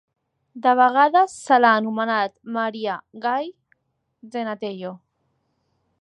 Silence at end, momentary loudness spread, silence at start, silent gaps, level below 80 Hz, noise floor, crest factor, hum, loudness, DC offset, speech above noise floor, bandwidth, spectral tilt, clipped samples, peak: 1.05 s; 15 LU; 0.55 s; none; -78 dBFS; -71 dBFS; 20 dB; none; -20 LUFS; under 0.1%; 50 dB; 11 kHz; -4.5 dB/octave; under 0.1%; -2 dBFS